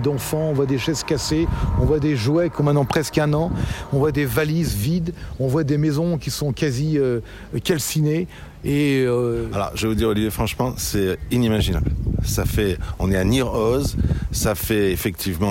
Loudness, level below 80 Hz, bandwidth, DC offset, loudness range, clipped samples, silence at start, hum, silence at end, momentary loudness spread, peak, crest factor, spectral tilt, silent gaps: -21 LUFS; -32 dBFS; 16.5 kHz; under 0.1%; 2 LU; under 0.1%; 0 s; none; 0 s; 5 LU; -6 dBFS; 14 dB; -6 dB/octave; none